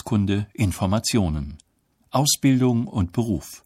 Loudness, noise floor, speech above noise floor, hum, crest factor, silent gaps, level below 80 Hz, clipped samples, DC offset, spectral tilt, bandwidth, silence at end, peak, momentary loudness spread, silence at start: -22 LUFS; -56 dBFS; 35 dB; none; 16 dB; none; -40 dBFS; under 0.1%; under 0.1%; -5 dB/octave; 16 kHz; 0.1 s; -8 dBFS; 8 LU; 0.05 s